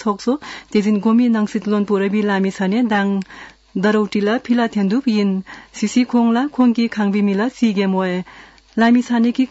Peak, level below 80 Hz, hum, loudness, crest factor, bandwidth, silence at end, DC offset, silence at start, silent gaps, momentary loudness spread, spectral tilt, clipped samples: -6 dBFS; -58 dBFS; none; -17 LUFS; 12 dB; 8 kHz; 0.05 s; under 0.1%; 0 s; none; 9 LU; -6.5 dB/octave; under 0.1%